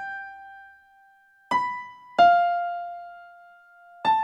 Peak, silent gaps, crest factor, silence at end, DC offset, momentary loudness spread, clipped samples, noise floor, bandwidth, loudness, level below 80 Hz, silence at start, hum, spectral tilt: -8 dBFS; none; 20 dB; 0 s; under 0.1%; 24 LU; under 0.1%; -58 dBFS; 7.8 kHz; -23 LUFS; -70 dBFS; 0 s; none; -4 dB/octave